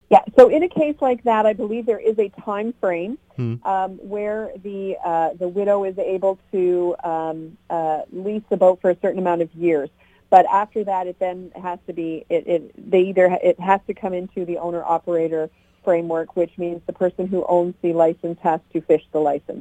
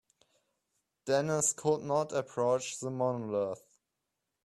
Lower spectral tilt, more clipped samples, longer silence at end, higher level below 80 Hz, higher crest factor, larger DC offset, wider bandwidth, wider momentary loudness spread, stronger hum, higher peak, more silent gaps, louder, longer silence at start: first, -8 dB/octave vs -4 dB/octave; neither; second, 0 s vs 0.85 s; first, -60 dBFS vs -74 dBFS; about the same, 20 dB vs 18 dB; neither; second, 9 kHz vs 13 kHz; first, 12 LU vs 9 LU; neither; first, 0 dBFS vs -16 dBFS; neither; first, -20 LUFS vs -32 LUFS; second, 0.1 s vs 1.05 s